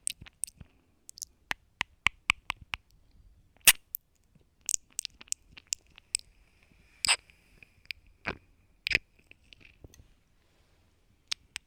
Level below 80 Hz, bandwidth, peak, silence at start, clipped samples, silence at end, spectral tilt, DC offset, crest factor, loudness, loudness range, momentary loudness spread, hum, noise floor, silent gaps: -60 dBFS; over 20 kHz; -6 dBFS; 0.1 s; under 0.1%; 2.65 s; 1 dB/octave; under 0.1%; 30 dB; -31 LUFS; 9 LU; 18 LU; none; -67 dBFS; none